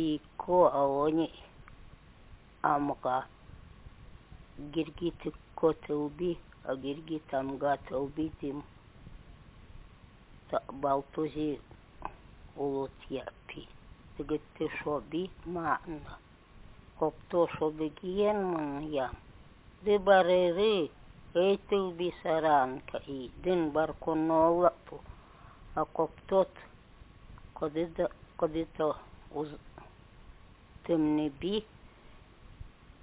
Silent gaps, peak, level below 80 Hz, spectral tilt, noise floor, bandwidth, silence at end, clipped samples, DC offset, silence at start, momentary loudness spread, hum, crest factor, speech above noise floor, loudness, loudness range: none; -12 dBFS; -56 dBFS; -4.5 dB/octave; -55 dBFS; 4 kHz; 0.35 s; under 0.1%; under 0.1%; 0 s; 17 LU; none; 22 dB; 24 dB; -32 LUFS; 8 LU